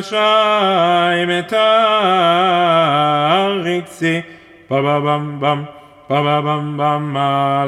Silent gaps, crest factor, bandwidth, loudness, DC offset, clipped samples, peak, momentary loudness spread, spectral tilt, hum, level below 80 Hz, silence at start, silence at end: none; 14 dB; 12.5 kHz; -15 LUFS; under 0.1%; under 0.1%; -2 dBFS; 7 LU; -6 dB/octave; none; -62 dBFS; 0 s; 0 s